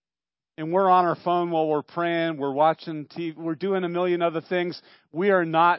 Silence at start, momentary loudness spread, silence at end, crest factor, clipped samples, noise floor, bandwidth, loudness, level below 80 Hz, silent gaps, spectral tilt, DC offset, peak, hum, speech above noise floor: 0.6 s; 12 LU; 0 s; 16 dB; under 0.1%; under -90 dBFS; 5.8 kHz; -24 LUFS; -80 dBFS; none; -10.5 dB/octave; under 0.1%; -8 dBFS; none; over 67 dB